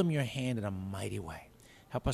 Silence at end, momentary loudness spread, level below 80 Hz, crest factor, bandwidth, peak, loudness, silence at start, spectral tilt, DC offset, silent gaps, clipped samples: 0 s; 15 LU; -56 dBFS; 18 dB; 14.5 kHz; -16 dBFS; -37 LUFS; 0 s; -6.5 dB/octave; under 0.1%; none; under 0.1%